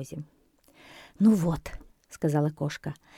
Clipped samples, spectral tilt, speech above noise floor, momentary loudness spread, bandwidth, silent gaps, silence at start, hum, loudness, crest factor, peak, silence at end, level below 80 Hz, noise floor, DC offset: under 0.1%; -7.5 dB/octave; 32 dB; 20 LU; 15.5 kHz; none; 0 s; none; -27 LUFS; 18 dB; -12 dBFS; 0.25 s; -52 dBFS; -59 dBFS; under 0.1%